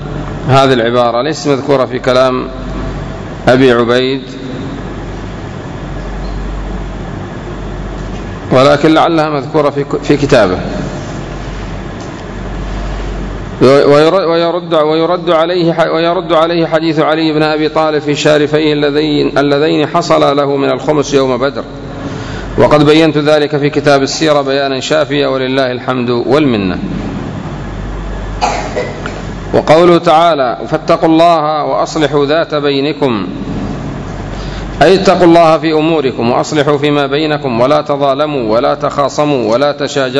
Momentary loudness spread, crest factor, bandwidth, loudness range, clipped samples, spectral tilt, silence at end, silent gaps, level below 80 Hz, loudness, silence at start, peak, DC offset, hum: 15 LU; 12 dB; 11 kHz; 6 LU; 1%; -6 dB/octave; 0 s; none; -28 dBFS; -11 LUFS; 0 s; 0 dBFS; under 0.1%; none